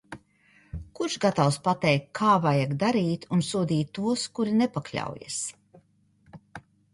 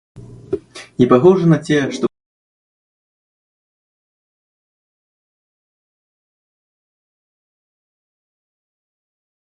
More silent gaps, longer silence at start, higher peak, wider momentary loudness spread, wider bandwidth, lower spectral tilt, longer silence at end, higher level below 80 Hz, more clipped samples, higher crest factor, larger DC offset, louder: neither; about the same, 0.1 s vs 0.15 s; second, -8 dBFS vs 0 dBFS; first, 21 LU vs 16 LU; about the same, 11.5 kHz vs 11 kHz; second, -5.5 dB/octave vs -7.5 dB/octave; second, 0.35 s vs 7.4 s; about the same, -56 dBFS vs -56 dBFS; neither; about the same, 18 dB vs 22 dB; neither; second, -26 LUFS vs -14 LUFS